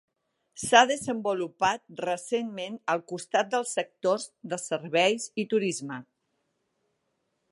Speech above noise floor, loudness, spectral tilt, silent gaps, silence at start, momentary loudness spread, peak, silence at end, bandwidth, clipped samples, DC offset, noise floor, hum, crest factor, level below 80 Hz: 50 dB; -27 LUFS; -3 dB/octave; none; 0.55 s; 14 LU; -4 dBFS; 1.5 s; 11.5 kHz; under 0.1%; under 0.1%; -77 dBFS; none; 26 dB; -72 dBFS